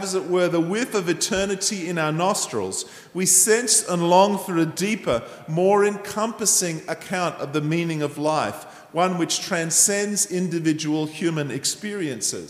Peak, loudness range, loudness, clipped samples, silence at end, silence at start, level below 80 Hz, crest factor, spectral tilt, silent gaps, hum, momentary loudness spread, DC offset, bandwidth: -2 dBFS; 4 LU; -21 LUFS; under 0.1%; 0 s; 0 s; -58 dBFS; 20 dB; -3 dB/octave; none; none; 10 LU; under 0.1%; 15.5 kHz